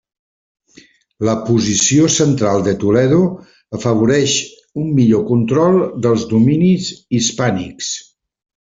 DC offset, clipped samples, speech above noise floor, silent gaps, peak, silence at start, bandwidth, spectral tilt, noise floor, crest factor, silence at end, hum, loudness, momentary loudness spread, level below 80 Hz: under 0.1%; under 0.1%; 34 dB; none; -2 dBFS; 1.2 s; 8 kHz; -5 dB/octave; -48 dBFS; 14 dB; 0.65 s; none; -15 LUFS; 10 LU; -50 dBFS